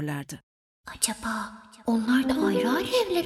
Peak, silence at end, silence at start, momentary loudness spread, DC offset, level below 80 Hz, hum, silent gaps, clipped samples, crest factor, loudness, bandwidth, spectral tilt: -8 dBFS; 0 s; 0 s; 17 LU; under 0.1%; -56 dBFS; none; 0.43-0.84 s; under 0.1%; 20 dB; -26 LUFS; 15 kHz; -4 dB/octave